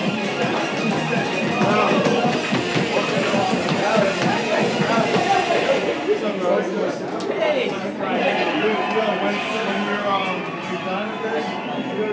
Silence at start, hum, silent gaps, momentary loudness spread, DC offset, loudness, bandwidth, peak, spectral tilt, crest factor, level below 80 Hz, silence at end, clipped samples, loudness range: 0 s; none; none; 6 LU; under 0.1%; -21 LUFS; 8 kHz; -4 dBFS; -5 dB/octave; 16 dB; -60 dBFS; 0 s; under 0.1%; 2 LU